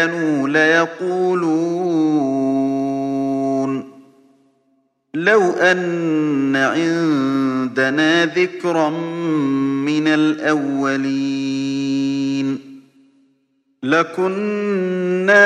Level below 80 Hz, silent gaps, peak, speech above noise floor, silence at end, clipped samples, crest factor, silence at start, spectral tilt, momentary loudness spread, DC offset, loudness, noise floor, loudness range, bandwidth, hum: -70 dBFS; none; 0 dBFS; 47 dB; 0 s; under 0.1%; 18 dB; 0 s; -5.5 dB/octave; 6 LU; under 0.1%; -18 LUFS; -64 dBFS; 5 LU; 9.6 kHz; none